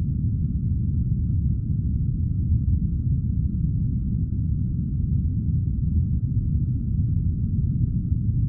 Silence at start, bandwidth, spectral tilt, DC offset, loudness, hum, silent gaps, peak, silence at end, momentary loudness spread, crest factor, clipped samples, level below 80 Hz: 0 s; 0.7 kHz; -18 dB/octave; under 0.1%; -25 LUFS; none; none; -10 dBFS; 0 s; 2 LU; 12 dB; under 0.1%; -28 dBFS